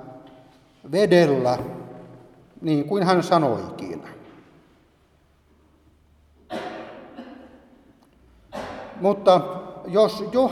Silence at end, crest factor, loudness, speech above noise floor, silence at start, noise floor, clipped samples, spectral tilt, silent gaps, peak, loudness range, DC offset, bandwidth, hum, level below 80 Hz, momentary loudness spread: 0 s; 22 dB; -22 LUFS; 40 dB; 0 s; -60 dBFS; under 0.1%; -6.5 dB/octave; none; -4 dBFS; 19 LU; under 0.1%; 14 kHz; none; -60 dBFS; 24 LU